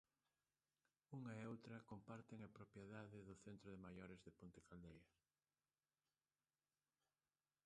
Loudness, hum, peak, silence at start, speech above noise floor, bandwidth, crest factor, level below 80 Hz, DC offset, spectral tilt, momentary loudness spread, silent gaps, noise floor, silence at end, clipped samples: -60 LUFS; none; -42 dBFS; 1.1 s; over 29 dB; 9.6 kHz; 20 dB; -82 dBFS; under 0.1%; -7 dB/octave; 8 LU; none; under -90 dBFS; 2.6 s; under 0.1%